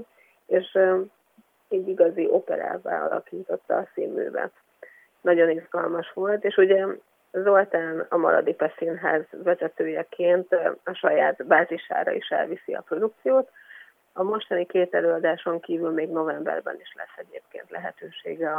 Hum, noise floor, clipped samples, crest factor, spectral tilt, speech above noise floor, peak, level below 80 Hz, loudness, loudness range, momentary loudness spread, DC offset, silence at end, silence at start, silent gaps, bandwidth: none; -62 dBFS; under 0.1%; 20 dB; -7.5 dB/octave; 38 dB; -4 dBFS; -88 dBFS; -24 LUFS; 4 LU; 15 LU; under 0.1%; 0 s; 0 s; none; 3.8 kHz